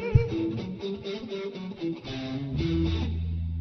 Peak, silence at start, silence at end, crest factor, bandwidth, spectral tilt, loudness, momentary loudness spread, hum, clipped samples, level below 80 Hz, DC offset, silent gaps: -6 dBFS; 0 s; 0 s; 24 dB; 6.4 kHz; -8 dB/octave; -31 LUFS; 9 LU; none; under 0.1%; -38 dBFS; under 0.1%; none